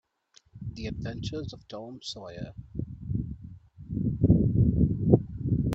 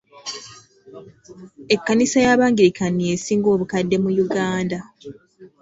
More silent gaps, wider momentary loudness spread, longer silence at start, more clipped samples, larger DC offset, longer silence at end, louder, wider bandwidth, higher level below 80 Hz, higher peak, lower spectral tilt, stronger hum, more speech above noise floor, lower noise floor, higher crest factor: neither; about the same, 18 LU vs 16 LU; first, 0.55 s vs 0.15 s; neither; neither; second, 0 s vs 0.15 s; second, -28 LUFS vs -19 LUFS; about the same, 8 kHz vs 8 kHz; first, -40 dBFS vs -56 dBFS; about the same, -2 dBFS vs -2 dBFS; first, -8.5 dB/octave vs -5 dB/octave; neither; about the same, 26 dB vs 23 dB; first, -63 dBFS vs -42 dBFS; first, 26 dB vs 18 dB